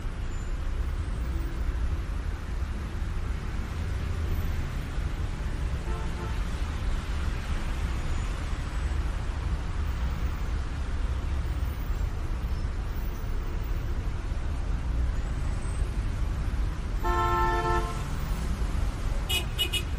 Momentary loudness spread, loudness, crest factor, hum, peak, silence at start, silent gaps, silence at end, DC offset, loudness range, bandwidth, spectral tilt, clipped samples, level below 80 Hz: 6 LU; -32 LUFS; 16 dB; none; -14 dBFS; 0 s; none; 0 s; under 0.1%; 4 LU; 15.5 kHz; -5.5 dB/octave; under 0.1%; -30 dBFS